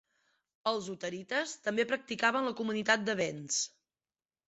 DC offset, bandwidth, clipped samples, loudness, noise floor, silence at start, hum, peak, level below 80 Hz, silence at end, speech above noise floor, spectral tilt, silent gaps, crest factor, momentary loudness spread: under 0.1%; 8.2 kHz; under 0.1%; -33 LUFS; under -90 dBFS; 0.65 s; none; -14 dBFS; -78 dBFS; 0.8 s; over 57 dB; -2.5 dB/octave; none; 22 dB; 8 LU